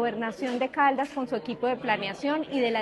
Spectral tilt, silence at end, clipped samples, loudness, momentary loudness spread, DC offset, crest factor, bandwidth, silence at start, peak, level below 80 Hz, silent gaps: -5 dB/octave; 0 s; under 0.1%; -28 LUFS; 7 LU; under 0.1%; 16 dB; 12 kHz; 0 s; -12 dBFS; -66 dBFS; none